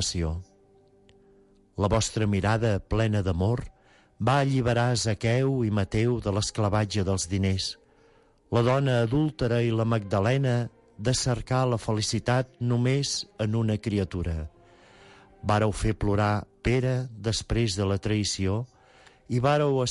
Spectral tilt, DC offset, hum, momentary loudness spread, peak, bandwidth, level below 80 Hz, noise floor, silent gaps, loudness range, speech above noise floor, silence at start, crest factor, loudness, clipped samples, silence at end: -5.5 dB/octave; under 0.1%; none; 7 LU; -12 dBFS; 11.5 kHz; -42 dBFS; -60 dBFS; none; 3 LU; 35 dB; 0 s; 14 dB; -26 LUFS; under 0.1%; 0 s